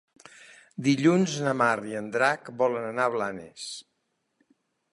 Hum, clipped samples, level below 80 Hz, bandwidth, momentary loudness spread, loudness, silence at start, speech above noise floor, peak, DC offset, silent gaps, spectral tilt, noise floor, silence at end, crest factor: none; under 0.1%; -72 dBFS; 11.5 kHz; 16 LU; -26 LUFS; 0.4 s; 48 dB; -8 dBFS; under 0.1%; none; -5.5 dB/octave; -74 dBFS; 1.1 s; 20 dB